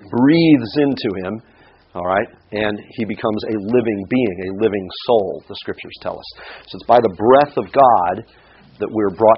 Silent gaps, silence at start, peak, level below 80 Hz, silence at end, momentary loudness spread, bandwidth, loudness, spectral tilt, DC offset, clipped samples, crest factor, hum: none; 0.05 s; 0 dBFS; -52 dBFS; 0 s; 16 LU; 5.8 kHz; -17 LUFS; -5 dB/octave; under 0.1%; under 0.1%; 18 dB; none